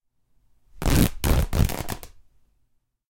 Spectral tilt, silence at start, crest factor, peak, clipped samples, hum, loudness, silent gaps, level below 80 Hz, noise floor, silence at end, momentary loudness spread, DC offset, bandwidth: -5.5 dB/octave; 0.75 s; 22 dB; -2 dBFS; under 0.1%; none; -24 LUFS; none; -30 dBFS; -68 dBFS; 1.05 s; 12 LU; under 0.1%; 17 kHz